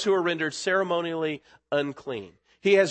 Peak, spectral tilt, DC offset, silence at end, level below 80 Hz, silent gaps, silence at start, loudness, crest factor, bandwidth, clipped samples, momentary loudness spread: -8 dBFS; -4.5 dB/octave; under 0.1%; 0 s; -72 dBFS; none; 0 s; -27 LUFS; 18 dB; 8.8 kHz; under 0.1%; 13 LU